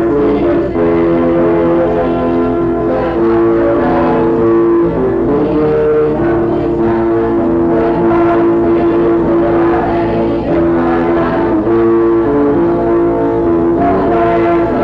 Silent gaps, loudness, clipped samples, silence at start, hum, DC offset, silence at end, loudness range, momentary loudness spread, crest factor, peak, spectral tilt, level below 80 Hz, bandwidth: none; -11 LUFS; under 0.1%; 0 s; none; under 0.1%; 0 s; 1 LU; 3 LU; 6 dB; -4 dBFS; -10 dB/octave; -30 dBFS; 4.9 kHz